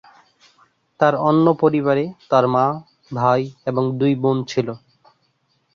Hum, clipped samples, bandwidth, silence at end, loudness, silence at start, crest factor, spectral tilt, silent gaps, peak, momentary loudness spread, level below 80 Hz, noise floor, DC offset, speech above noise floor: none; under 0.1%; 7.2 kHz; 0.95 s; -19 LUFS; 1 s; 18 dB; -7.5 dB/octave; none; -2 dBFS; 8 LU; -62 dBFS; -66 dBFS; under 0.1%; 48 dB